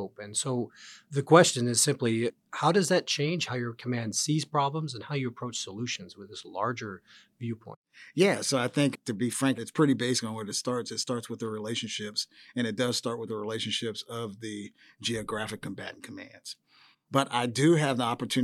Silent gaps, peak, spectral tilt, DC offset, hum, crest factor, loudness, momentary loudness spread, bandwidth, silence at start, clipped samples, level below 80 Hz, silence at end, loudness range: 7.76-7.82 s; -4 dBFS; -4 dB/octave; under 0.1%; none; 24 dB; -29 LUFS; 16 LU; 15 kHz; 0 s; under 0.1%; -74 dBFS; 0 s; 9 LU